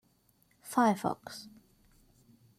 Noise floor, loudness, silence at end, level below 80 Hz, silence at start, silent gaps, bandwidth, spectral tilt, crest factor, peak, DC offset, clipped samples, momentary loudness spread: -69 dBFS; -31 LUFS; 1.1 s; -72 dBFS; 0.65 s; none; 16 kHz; -5 dB/octave; 20 dB; -14 dBFS; under 0.1%; under 0.1%; 24 LU